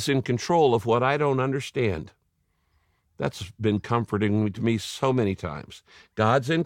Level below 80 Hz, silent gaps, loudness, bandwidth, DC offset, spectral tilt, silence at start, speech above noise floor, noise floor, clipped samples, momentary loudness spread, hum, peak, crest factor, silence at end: -56 dBFS; none; -25 LUFS; 16.5 kHz; under 0.1%; -6 dB/octave; 0 s; 47 dB; -71 dBFS; under 0.1%; 13 LU; none; -8 dBFS; 18 dB; 0 s